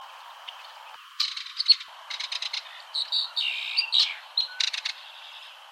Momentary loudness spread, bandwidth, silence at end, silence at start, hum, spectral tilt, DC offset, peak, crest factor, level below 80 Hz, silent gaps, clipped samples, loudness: 22 LU; 16 kHz; 0 s; 0 s; none; 8 dB/octave; under 0.1%; -6 dBFS; 24 dB; under -90 dBFS; none; under 0.1%; -25 LUFS